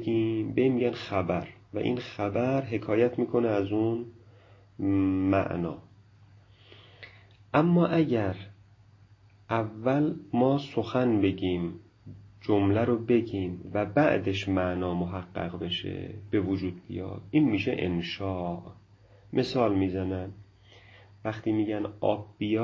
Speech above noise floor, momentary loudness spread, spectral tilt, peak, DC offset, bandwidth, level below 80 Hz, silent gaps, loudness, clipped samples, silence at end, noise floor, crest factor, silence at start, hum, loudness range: 30 dB; 12 LU; -8 dB/octave; -8 dBFS; under 0.1%; 7.4 kHz; -52 dBFS; none; -28 LUFS; under 0.1%; 0 s; -57 dBFS; 20 dB; 0 s; none; 3 LU